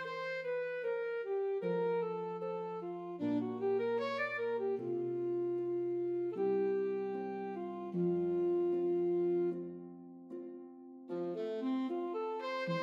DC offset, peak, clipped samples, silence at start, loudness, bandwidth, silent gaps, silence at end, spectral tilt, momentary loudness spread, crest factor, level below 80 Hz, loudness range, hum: under 0.1%; -24 dBFS; under 0.1%; 0 s; -37 LUFS; 6.6 kHz; none; 0 s; -8 dB/octave; 11 LU; 12 dB; -88 dBFS; 3 LU; none